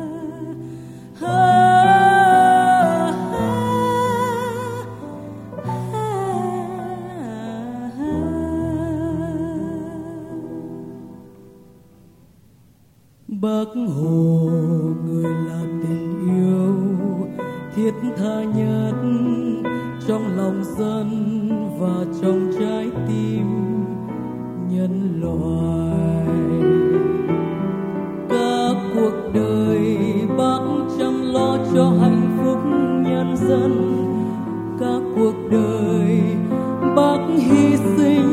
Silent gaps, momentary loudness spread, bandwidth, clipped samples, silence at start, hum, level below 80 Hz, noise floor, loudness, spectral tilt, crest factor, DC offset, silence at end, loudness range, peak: none; 14 LU; 15 kHz; under 0.1%; 0 s; none; -48 dBFS; -53 dBFS; -19 LUFS; -7.5 dB/octave; 16 dB; under 0.1%; 0 s; 11 LU; -2 dBFS